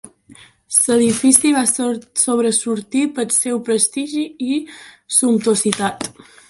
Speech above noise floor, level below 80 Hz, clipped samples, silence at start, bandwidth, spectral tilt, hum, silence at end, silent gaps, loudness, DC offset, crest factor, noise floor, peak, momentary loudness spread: 29 dB; -60 dBFS; under 0.1%; 0.05 s; 13 kHz; -3 dB/octave; none; 0.4 s; none; -16 LUFS; under 0.1%; 18 dB; -46 dBFS; 0 dBFS; 11 LU